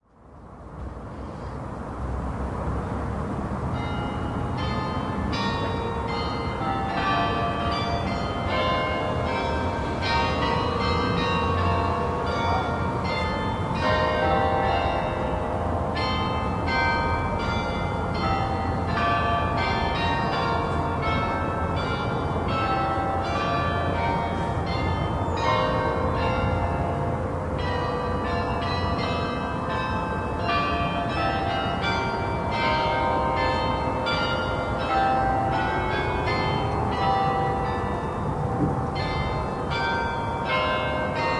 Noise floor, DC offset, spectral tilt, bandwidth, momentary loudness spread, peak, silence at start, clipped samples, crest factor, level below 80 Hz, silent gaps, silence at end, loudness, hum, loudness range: -47 dBFS; under 0.1%; -6.5 dB/octave; 11 kHz; 5 LU; -10 dBFS; 0.25 s; under 0.1%; 16 dB; -38 dBFS; none; 0 s; -25 LUFS; none; 3 LU